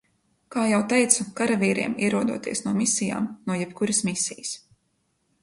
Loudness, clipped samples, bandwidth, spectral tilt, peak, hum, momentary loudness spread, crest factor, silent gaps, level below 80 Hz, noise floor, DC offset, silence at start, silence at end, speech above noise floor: -24 LUFS; under 0.1%; 11.5 kHz; -3.5 dB/octave; -4 dBFS; none; 8 LU; 22 dB; none; -64 dBFS; -71 dBFS; under 0.1%; 0.5 s; 0.85 s; 47 dB